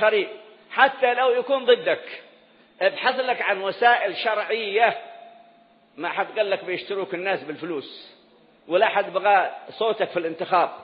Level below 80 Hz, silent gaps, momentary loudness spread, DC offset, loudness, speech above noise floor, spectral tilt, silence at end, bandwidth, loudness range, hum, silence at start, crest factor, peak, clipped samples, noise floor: -82 dBFS; none; 13 LU; under 0.1%; -23 LUFS; 33 dB; -8 dB/octave; 0 s; 5.4 kHz; 7 LU; none; 0 s; 20 dB; -2 dBFS; under 0.1%; -56 dBFS